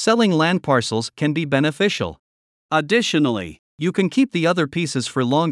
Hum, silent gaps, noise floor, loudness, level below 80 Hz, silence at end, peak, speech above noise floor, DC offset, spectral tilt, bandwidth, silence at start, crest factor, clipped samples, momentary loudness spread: none; 2.19-2.69 s, 3.59-3.78 s; under -90 dBFS; -20 LUFS; -60 dBFS; 0 s; -4 dBFS; over 71 dB; under 0.1%; -5 dB/octave; 12 kHz; 0 s; 16 dB; under 0.1%; 8 LU